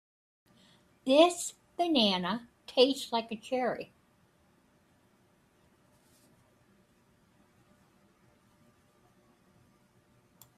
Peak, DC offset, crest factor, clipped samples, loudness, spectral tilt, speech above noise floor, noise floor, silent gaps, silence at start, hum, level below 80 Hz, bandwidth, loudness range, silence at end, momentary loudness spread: -8 dBFS; under 0.1%; 26 dB; under 0.1%; -29 LUFS; -3.5 dB/octave; 39 dB; -67 dBFS; none; 1.05 s; none; -76 dBFS; 15 kHz; 13 LU; 6.75 s; 15 LU